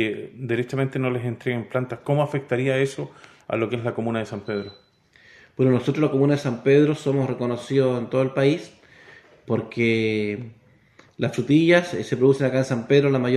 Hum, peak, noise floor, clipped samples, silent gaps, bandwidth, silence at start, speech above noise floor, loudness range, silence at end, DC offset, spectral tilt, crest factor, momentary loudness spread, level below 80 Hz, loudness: none; -2 dBFS; -55 dBFS; under 0.1%; none; 11.5 kHz; 0 s; 33 dB; 5 LU; 0 s; under 0.1%; -7 dB/octave; 20 dB; 11 LU; -62 dBFS; -22 LUFS